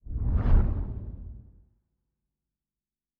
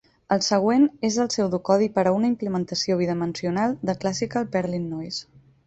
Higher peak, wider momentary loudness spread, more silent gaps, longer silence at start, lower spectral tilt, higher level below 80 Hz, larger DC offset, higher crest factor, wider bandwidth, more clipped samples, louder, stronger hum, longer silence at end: second, -10 dBFS vs -6 dBFS; first, 20 LU vs 8 LU; neither; second, 0.05 s vs 0.3 s; first, -10 dB/octave vs -5 dB/octave; first, -30 dBFS vs -60 dBFS; neither; about the same, 18 dB vs 18 dB; second, 3.1 kHz vs 8.2 kHz; neither; second, -29 LUFS vs -23 LUFS; neither; first, 1.8 s vs 0.45 s